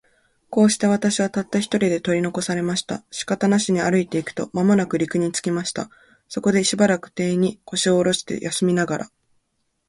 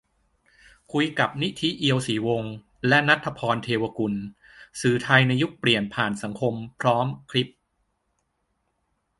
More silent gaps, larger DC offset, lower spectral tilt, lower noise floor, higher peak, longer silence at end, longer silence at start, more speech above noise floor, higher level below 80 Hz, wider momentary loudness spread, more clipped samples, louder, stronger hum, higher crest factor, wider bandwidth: neither; neither; about the same, -4.5 dB/octave vs -5.5 dB/octave; about the same, -71 dBFS vs -74 dBFS; second, -6 dBFS vs -2 dBFS; second, 0.85 s vs 1.7 s; second, 0.5 s vs 0.95 s; about the same, 51 dB vs 50 dB; about the same, -60 dBFS vs -60 dBFS; about the same, 8 LU vs 10 LU; neither; first, -21 LUFS vs -24 LUFS; neither; second, 16 dB vs 24 dB; about the same, 11.5 kHz vs 11.5 kHz